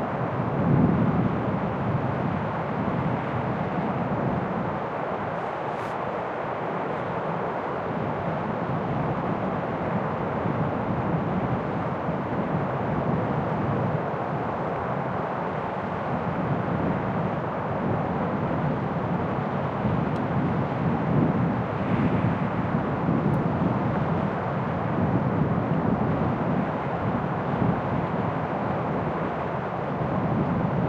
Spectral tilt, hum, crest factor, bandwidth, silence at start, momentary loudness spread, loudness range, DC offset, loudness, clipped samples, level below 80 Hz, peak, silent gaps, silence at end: -9.5 dB/octave; none; 18 dB; 7 kHz; 0 s; 5 LU; 3 LU; under 0.1%; -27 LUFS; under 0.1%; -48 dBFS; -8 dBFS; none; 0 s